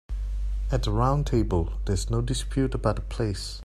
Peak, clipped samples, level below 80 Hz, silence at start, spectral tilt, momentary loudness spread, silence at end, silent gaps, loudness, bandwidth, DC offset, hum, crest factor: -8 dBFS; under 0.1%; -30 dBFS; 0.1 s; -6.5 dB/octave; 7 LU; 0.05 s; none; -27 LUFS; 12.5 kHz; under 0.1%; none; 18 dB